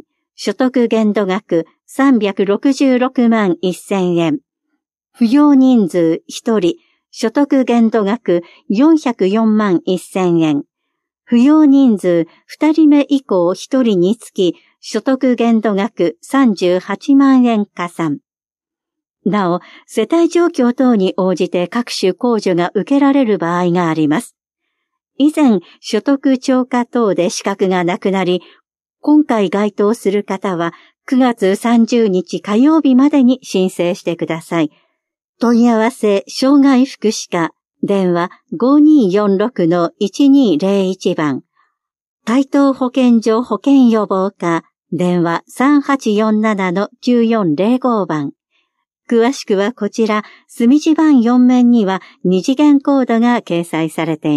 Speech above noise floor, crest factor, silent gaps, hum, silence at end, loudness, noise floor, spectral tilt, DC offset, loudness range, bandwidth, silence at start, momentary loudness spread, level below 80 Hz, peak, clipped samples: over 77 dB; 12 dB; 35.24-35.34 s, 42.01-42.18 s; none; 0 s; -14 LUFS; under -90 dBFS; -6 dB/octave; under 0.1%; 3 LU; 12.5 kHz; 0.4 s; 9 LU; -70 dBFS; -2 dBFS; under 0.1%